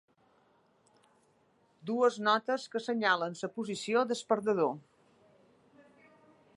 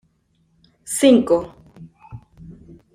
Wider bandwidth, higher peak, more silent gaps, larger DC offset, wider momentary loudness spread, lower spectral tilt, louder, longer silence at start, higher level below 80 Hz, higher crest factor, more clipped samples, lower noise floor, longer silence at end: second, 11.5 kHz vs 15.5 kHz; second, -14 dBFS vs -2 dBFS; neither; neither; second, 9 LU vs 27 LU; about the same, -4 dB/octave vs -4.5 dB/octave; second, -31 LUFS vs -17 LUFS; first, 1.85 s vs 0.85 s; second, -86 dBFS vs -54 dBFS; about the same, 20 dB vs 20 dB; neither; first, -69 dBFS vs -64 dBFS; first, 1.75 s vs 0.45 s